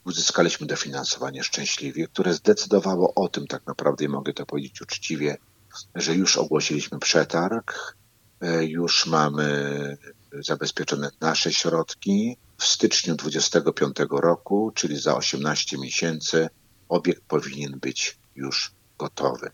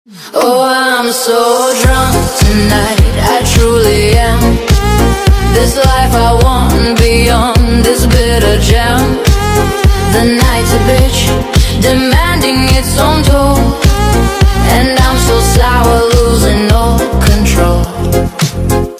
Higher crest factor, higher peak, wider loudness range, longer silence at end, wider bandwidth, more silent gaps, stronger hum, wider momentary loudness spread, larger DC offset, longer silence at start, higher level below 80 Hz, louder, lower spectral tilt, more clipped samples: first, 22 dB vs 8 dB; about the same, -2 dBFS vs 0 dBFS; first, 4 LU vs 1 LU; about the same, 0.05 s vs 0 s; about the same, 17 kHz vs 16 kHz; neither; neither; first, 12 LU vs 2 LU; neither; about the same, 0.05 s vs 0.1 s; second, -68 dBFS vs -12 dBFS; second, -24 LUFS vs -9 LUFS; second, -3.5 dB/octave vs -5 dB/octave; second, under 0.1% vs 1%